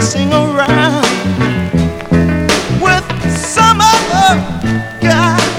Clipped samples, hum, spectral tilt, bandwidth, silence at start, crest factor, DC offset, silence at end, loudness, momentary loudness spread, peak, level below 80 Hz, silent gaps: 0.2%; none; -4.5 dB/octave; over 20 kHz; 0 s; 12 dB; under 0.1%; 0 s; -11 LUFS; 7 LU; 0 dBFS; -30 dBFS; none